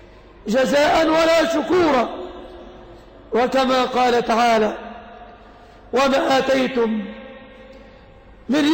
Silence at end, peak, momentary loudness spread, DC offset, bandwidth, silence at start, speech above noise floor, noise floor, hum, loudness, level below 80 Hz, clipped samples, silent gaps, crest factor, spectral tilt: 0 s; -8 dBFS; 20 LU; under 0.1%; 16.5 kHz; 0.45 s; 28 dB; -45 dBFS; none; -18 LUFS; -48 dBFS; under 0.1%; none; 12 dB; -4 dB/octave